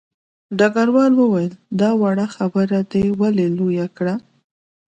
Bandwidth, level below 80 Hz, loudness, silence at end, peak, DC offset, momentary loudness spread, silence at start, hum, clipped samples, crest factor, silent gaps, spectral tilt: 8.6 kHz; -54 dBFS; -18 LUFS; 0.7 s; -4 dBFS; under 0.1%; 9 LU; 0.5 s; none; under 0.1%; 14 dB; none; -7.5 dB/octave